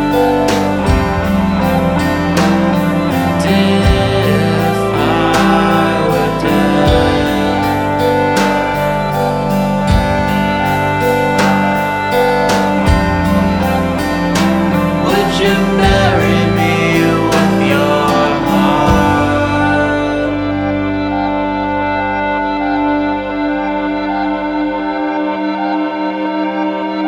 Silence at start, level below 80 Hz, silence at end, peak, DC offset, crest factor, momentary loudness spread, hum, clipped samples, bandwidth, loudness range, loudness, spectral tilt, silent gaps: 0 s; -26 dBFS; 0 s; 0 dBFS; under 0.1%; 12 dB; 6 LU; none; under 0.1%; over 20 kHz; 4 LU; -13 LUFS; -6 dB/octave; none